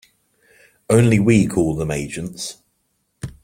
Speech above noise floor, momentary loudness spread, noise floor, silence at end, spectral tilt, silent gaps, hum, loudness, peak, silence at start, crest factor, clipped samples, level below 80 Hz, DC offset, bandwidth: 52 dB; 16 LU; -69 dBFS; 0.15 s; -6.5 dB/octave; none; none; -18 LUFS; -2 dBFS; 0.9 s; 18 dB; under 0.1%; -44 dBFS; under 0.1%; 15.5 kHz